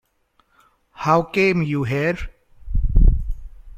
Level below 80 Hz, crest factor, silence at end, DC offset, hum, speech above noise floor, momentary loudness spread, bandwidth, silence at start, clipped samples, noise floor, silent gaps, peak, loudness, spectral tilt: -22 dBFS; 18 dB; 0 s; under 0.1%; none; 44 dB; 14 LU; 7.2 kHz; 1 s; under 0.1%; -64 dBFS; none; -2 dBFS; -21 LUFS; -7.5 dB/octave